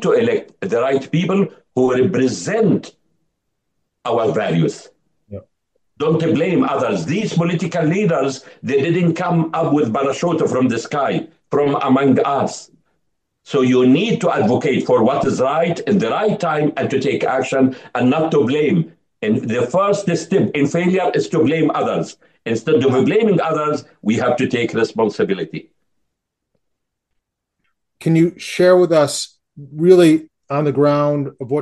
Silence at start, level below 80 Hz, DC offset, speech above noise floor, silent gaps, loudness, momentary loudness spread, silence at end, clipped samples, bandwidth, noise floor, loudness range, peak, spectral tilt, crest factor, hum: 0 s; -60 dBFS; under 0.1%; 60 dB; none; -17 LUFS; 8 LU; 0 s; under 0.1%; 12.5 kHz; -76 dBFS; 6 LU; 0 dBFS; -6.5 dB/octave; 18 dB; none